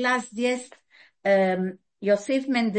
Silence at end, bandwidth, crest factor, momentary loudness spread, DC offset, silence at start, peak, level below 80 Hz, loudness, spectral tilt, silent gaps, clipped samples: 0 s; 8.8 kHz; 16 dB; 10 LU; under 0.1%; 0 s; -8 dBFS; -76 dBFS; -25 LUFS; -5 dB/octave; none; under 0.1%